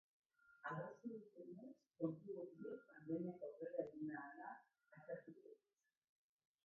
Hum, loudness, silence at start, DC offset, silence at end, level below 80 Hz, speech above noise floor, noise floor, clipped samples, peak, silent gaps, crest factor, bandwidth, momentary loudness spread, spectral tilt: none; -52 LUFS; 0.45 s; under 0.1%; 1.1 s; under -90 dBFS; over 39 dB; under -90 dBFS; under 0.1%; -30 dBFS; none; 22 dB; 6.2 kHz; 15 LU; -8 dB/octave